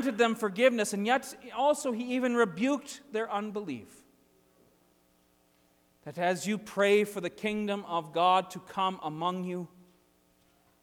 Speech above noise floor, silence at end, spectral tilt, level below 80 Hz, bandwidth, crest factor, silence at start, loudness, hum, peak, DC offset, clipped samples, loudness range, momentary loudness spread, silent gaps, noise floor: 38 dB; 1.15 s; -4.5 dB/octave; -74 dBFS; 19 kHz; 20 dB; 0 s; -30 LUFS; none; -12 dBFS; under 0.1%; under 0.1%; 9 LU; 13 LU; none; -67 dBFS